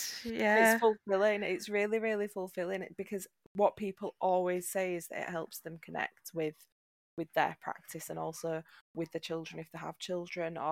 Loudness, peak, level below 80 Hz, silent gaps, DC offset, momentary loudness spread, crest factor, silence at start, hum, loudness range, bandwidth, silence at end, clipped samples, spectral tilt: -34 LUFS; -14 dBFS; -76 dBFS; 3.46-3.55 s, 6.72-7.17 s, 8.81-8.94 s; under 0.1%; 14 LU; 20 dB; 0 s; none; 8 LU; 16.5 kHz; 0 s; under 0.1%; -4 dB/octave